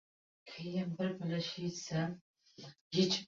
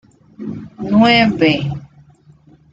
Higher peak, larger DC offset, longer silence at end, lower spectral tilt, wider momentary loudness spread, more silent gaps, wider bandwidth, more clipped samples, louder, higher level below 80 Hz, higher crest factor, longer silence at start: second, -18 dBFS vs -2 dBFS; neither; second, 0 s vs 0.85 s; second, -5 dB/octave vs -6.5 dB/octave; about the same, 19 LU vs 19 LU; first, 2.21-2.34 s, 2.81-2.91 s vs none; about the same, 7.6 kHz vs 7.8 kHz; neither; second, -38 LUFS vs -13 LUFS; second, -74 dBFS vs -46 dBFS; about the same, 20 dB vs 16 dB; about the same, 0.45 s vs 0.4 s